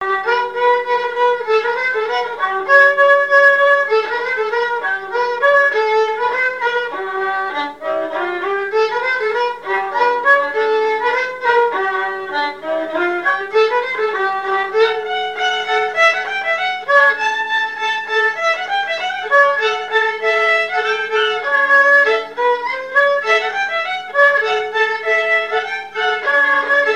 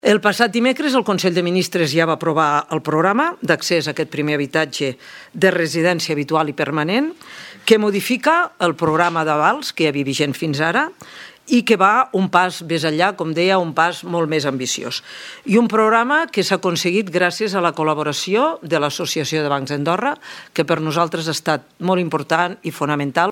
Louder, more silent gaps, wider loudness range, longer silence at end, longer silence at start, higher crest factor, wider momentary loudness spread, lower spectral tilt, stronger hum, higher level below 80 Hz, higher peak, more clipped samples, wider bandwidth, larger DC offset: first, -15 LUFS vs -18 LUFS; neither; about the same, 4 LU vs 3 LU; about the same, 0 s vs 0 s; about the same, 0 s vs 0.05 s; about the same, 16 dB vs 18 dB; about the same, 9 LU vs 7 LU; second, -1.5 dB/octave vs -4.5 dB/octave; neither; about the same, -66 dBFS vs -66 dBFS; about the same, 0 dBFS vs 0 dBFS; neither; second, 9.8 kHz vs 18 kHz; first, 0.3% vs under 0.1%